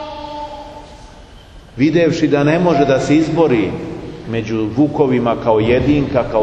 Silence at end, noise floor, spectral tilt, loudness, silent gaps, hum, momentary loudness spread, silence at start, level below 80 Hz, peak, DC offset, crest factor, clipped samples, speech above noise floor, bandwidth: 0 s; -39 dBFS; -7 dB/octave; -15 LUFS; none; none; 16 LU; 0 s; -38 dBFS; 0 dBFS; under 0.1%; 16 dB; under 0.1%; 25 dB; 8.6 kHz